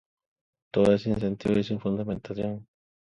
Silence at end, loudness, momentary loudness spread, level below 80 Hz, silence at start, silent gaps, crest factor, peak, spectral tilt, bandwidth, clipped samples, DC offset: 0.45 s; -27 LUFS; 10 LU; -54 dBFS; 0.75 s; none; 20 dB; -8 dBFS; -8 dB/octave; 10.5 kHz; under 0.1%; under 0.1%